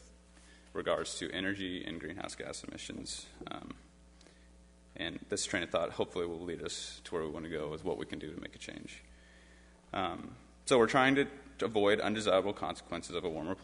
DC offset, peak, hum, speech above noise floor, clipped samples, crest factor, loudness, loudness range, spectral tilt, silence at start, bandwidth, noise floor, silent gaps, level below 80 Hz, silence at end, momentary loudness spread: under 0.1%; -12 dBFS; none; 25 dB; under 0.1%; 24 dB; -35 LUFS; 11 LU; -4 dB/octave; 0 s; 10.5 kHz; -60 dBFS; none; -60 dBFS; 0 s; 16 LU